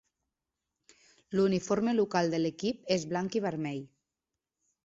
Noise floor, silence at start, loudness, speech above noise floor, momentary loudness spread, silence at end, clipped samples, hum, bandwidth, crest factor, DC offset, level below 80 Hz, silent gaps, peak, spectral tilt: -89 dBFS; 1.3 s; -31 LUFS; 59 dB; 8 LU; 1 s; under 0.1%; none; 7.8 kHz; 20 dB; under 0.1%; -68 dBFS; none; -12 dBFS; -5.5 dB/octave